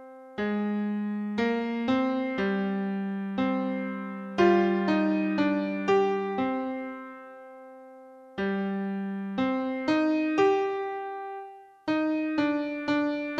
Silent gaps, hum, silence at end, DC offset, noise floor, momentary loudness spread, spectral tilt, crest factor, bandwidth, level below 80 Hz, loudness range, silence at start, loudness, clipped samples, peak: none; none; 0 s; under 0.1%; -49 dBFS; 16 LU; -7.5 dB/octave; 18 dB; 7.6 kHz; -66 dBFS; 5 LU; 0 s; -28 LUFS; under 0.1%; -10 dBFS